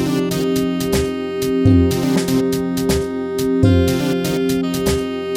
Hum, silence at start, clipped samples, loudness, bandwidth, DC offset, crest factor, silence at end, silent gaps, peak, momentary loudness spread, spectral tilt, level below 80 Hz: none; 0 s; under 0.1%; -17 LUFS; 17 kHz; under 0.1%; 16 dB; 0 s; none; -2 dBFS; 6 LU; -6 dB/octave; -34 dBFS